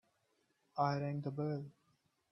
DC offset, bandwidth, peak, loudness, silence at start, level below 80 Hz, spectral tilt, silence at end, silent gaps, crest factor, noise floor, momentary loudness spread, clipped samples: under 0.1%; 6.2 kHz; -22 dBFS; -40 LUFS; 0.75 s; -80 dBFS; -8.5 dB/octave; 0.6 s; none; 20 dB; -79 dBFS; 11 LU; under 0.1%